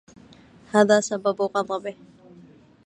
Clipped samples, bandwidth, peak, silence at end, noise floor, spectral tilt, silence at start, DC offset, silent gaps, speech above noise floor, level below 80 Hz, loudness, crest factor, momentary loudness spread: under 0.1%; 10 kHz; -2 dBFS; 0.95 s; -50 dBFS; -4.5 dB/octave; 0.75 s; under 0.1%; none; 29 dB; -68 dBFS; -22 LUFS; 22 dB; 12 LU